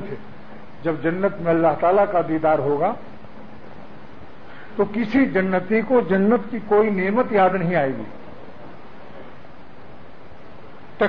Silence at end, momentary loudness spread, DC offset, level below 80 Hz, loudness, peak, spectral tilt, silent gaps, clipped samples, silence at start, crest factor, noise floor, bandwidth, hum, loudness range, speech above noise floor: 0 s; 24 LU; 2%; -56 dBFS; -20 LUFS; -6 dBFS; -9.5 dB/octave; none; under 0.1%; 0 s; 16 dB; -44 dBFS; 5.4 kHz; none; 6 LU; 25 dB